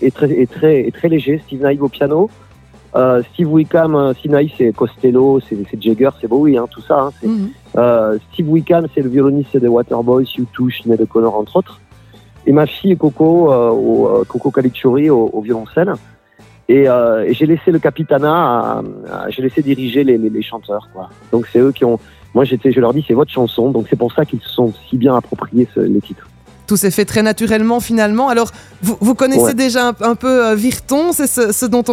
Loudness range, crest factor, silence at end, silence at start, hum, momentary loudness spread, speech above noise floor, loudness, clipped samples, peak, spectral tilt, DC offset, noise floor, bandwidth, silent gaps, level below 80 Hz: 2 LU; 14 dB; 0 s; 0 s; none; 7 LU; 32 dB; -14 LUFS; under 0.1%; 0 dBFS; -6 dB/octave; under 0.1%; -45 dBFS; 16.5 kHz; none; -48 dBFS